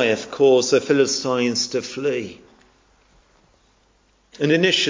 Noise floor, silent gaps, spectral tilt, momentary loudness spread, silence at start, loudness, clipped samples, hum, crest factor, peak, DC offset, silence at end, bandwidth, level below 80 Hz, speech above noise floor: -60 dBFS; none; -3.5 dB/octave; 9 LU; 0 s; -19 LUFS; under 0.1%; none; 20 dB; -2 dBFS; under 0.1%; 0 s; 7.6 kHz; -62 dBFS; 41 dB